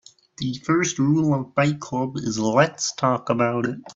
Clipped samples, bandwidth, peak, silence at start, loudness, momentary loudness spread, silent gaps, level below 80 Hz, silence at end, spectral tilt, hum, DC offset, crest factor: under 0.1%; 8 kHz; -2 dBFS; 0.4 s; -22 LUFS; 7 LU; none; -60 dBFS; 0.05 s; -5 dB/octave; none; under 0.1%; 20 dB